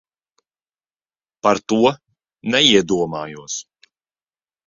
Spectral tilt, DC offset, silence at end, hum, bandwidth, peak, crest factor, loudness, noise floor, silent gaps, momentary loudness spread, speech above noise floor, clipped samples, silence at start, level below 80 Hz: -3.5 dB/octave; under 0.1%; 1.05 s; none; 7.6 kHz; 0 dBFS; 20 dB; -18 LUFS; under -90 dBFS; none; 16 LU; over 73 dB; under 0.1%; 1.45 s; -58 dBFS